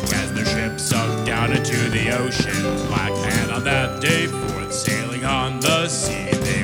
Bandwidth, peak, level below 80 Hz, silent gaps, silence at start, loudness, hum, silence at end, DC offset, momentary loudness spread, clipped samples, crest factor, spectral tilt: over 20 kHz; -2 dBFS; -38 dBFS; none; 0 s; -20 LUFS; none; 0 s; under 0.1%; 3 LU; under 0.1%; 18 dB; -4 dB/octave